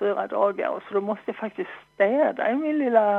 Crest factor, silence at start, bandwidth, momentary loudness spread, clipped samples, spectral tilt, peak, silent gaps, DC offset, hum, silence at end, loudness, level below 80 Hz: 18 dB; 0 s; 4.2 kHz; 11 LU; under 0.1%; -8 dB/octave; -6 dBFS; none; under 0.1%; none; 0 s; -25 LUFS; -74 dBFS